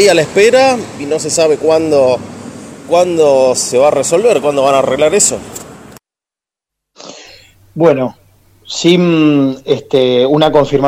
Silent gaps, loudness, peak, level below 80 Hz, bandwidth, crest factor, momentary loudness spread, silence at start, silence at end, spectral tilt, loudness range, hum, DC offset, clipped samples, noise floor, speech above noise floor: none; -11 LUFS; 0 dBFS; -46 dBFS; 16 kHz; 12 dB; 17 LU; 0 s; 0 s; -4 dB/octave; 6 LU; none; under 0.1%; under 0.1%; -88 dBFS; 78 dB